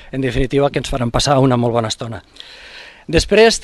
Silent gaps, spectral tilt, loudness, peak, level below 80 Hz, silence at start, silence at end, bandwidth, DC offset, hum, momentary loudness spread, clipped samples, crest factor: none; -5 dB/octave; -16 LUFS; 0 dBFS; -32 dBFS; 0 s; 0 s; 12.5 kHz; under 0.1%; none; 22 LU; under 0.1%; 16 dB